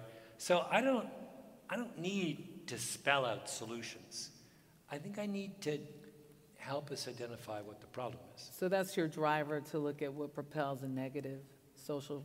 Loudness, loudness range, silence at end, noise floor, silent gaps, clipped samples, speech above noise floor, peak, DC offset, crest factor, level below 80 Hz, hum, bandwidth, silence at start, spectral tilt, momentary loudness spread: -39 LUFS; 7 LU; 0 s; -64 dBFS; none; under 0.1%; 25 dB; -16 dBFS; under 0.1%; 24 dB; -80 dBFS; none; 16 kHz; 0 s; -4.5 dB/octave; 17 LU